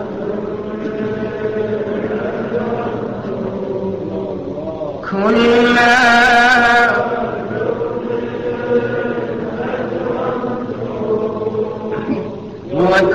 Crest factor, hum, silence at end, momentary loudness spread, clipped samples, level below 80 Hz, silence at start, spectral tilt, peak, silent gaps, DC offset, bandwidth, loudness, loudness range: 12 dB; none; 0 s; 14 LU; under 0.1%; -44 dBFS; 0 s; -5.5 dB/octave; -4 dBFS; none; 0.3%; 13 kHz; -16 LUFS; 9 LU